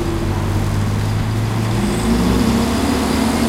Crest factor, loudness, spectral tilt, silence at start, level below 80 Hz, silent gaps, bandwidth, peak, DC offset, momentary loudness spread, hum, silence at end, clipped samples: 14 dB; -18 LUFS; -6 dB/octave; 0 s; -26 dBFS; none; 16 kHz; -4 dBFS; under 0.1%; 4 LU; none; 0 s; under 0.1%